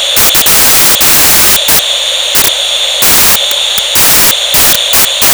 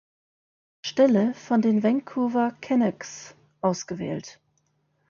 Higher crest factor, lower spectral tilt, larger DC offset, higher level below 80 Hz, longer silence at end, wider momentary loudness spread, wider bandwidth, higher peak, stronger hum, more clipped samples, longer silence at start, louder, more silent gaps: second, 6 dB vs 18 dB; second, 0.5 dB/octave vs -6 dB/octave; neither; first, -34 dBFS vs -70 dBFS; second, 0 s vs 0.8 s; second, 5 LU vs 16 LU; first, over 20 kHz vs 7.2 kHz; first, 0 dBFS vs -8 dBFS; neither; neither; second, 0 s vs 0.85 s; first, -4 LUFS vs -24 LUFS; neither